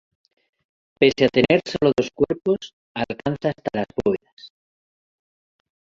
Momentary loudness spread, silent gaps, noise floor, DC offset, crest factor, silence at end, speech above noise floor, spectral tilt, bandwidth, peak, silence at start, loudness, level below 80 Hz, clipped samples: 11 LU; 2.73-2.95 s, 4.33-4.37 s; under -90 dBFS; under 0.1%; 22 dB; 1.5 s; over 69 dB; -6 dB/octave; 7.6 kHz; -2 dBFS; 1 s; -21 LUFS; -52 dBFS; under 0.1%